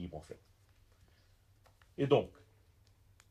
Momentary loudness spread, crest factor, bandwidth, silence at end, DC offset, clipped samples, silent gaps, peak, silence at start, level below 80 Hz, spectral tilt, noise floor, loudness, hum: 24 LU; 24 dB; 11 kHz; 1 s; under 0.1%; under 0.1%; none; -16 dBFS; 0 s; -66 dBFS; -7.5 dB/octave; -67 dBFS; -34 LUFS; none